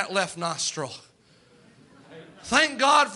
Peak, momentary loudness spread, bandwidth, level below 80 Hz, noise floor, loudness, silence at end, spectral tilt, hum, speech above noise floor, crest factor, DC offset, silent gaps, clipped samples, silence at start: -6 dBFS; 19 LU; 11.5 kHz; -64 dBFS; -58 dBFS; -23 LUFS; 0 s; -2 dB/octave; none; 34 dB; 20 dB; under 0.1%; none; under 0.1%; 0 s